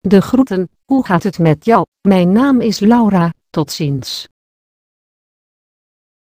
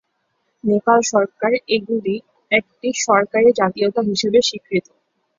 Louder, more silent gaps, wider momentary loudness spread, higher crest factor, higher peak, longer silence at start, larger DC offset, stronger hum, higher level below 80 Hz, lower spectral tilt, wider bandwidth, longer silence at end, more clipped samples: first, -13 LUFS vs -18 LUFS; first, 1.88-1.92 s vs none; about the same, 10 LU vs 9 LU; about the same, 14 dB vs 18 dB; about the same, 0 dBFS vs -2 dBFS; second, 0.05 s vs 0.65 s; neither; neither; first, -48 dBFS vs -62 dBFS; first, -7 dB/octave vs -3.5 dB/octave; first, 15.5 kHz vs 7.6 kHz; first, 2.1 s vs 0.6 s; neither